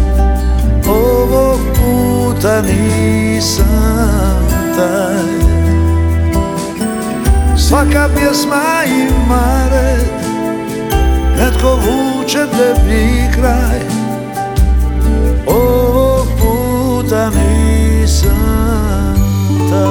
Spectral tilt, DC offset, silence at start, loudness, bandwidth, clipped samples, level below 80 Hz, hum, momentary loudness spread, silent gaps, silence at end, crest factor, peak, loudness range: -6 dB/octave; under 0.1%; 0 s; -12 LUFS; 19.5 kHz; under 0.1%; -14 dBFS; none; 5 LU; none; 0 s; 10 dB; 0 dBFS; 1 LU